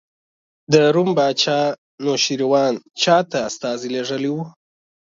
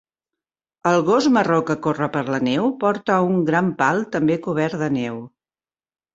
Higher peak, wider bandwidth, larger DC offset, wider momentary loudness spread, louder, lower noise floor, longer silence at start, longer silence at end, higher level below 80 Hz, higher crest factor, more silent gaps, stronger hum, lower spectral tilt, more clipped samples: first, 0 dBFS vs -4 dBFS; about the same, 7.8 kHz vs 8 kHz; neither; first, 9 LU vs 6 LU; about the same, -19 LUFS vs -20 LUFS; about the same, under -90 dBFS vs under -90 dBFS; second, 0.7 s vs 0.85 s; second, 0.55 s vs 0.85 s; second, -66 dBFS vs -60 dBFS; about the same, 20 dB vs 18 dB; first, 1.78-1.98 s vs none; neither; second, -4 dB/octave vs -6.5 dB/octave; neither